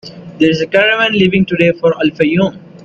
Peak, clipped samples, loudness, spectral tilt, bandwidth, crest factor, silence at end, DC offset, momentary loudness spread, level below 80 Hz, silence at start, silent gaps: 0 dBFS; under 0.1%; -12 LUFS; -6.5 dB/octave; 7.6 kHz; 12 dB; 0.05 s; under 0.1%; 4 LU; -48 dBFS; 0.05 s; none